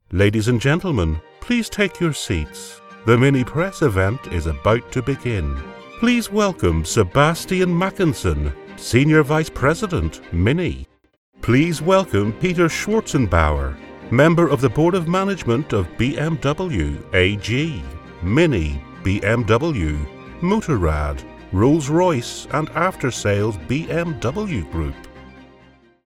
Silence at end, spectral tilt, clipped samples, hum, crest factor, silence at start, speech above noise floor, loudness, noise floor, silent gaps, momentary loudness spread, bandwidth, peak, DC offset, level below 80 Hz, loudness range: 0.6 s; -6 dB/octave; under 0.1%; none; 18 dB; 0.1 s; 32 dB; -19 LUFS; -51 dBFS; 11.17-11.32 s; 10 LU; 15.5 kHz; 0 dBFS; under 0.1%; -32 dBFS; 3 LU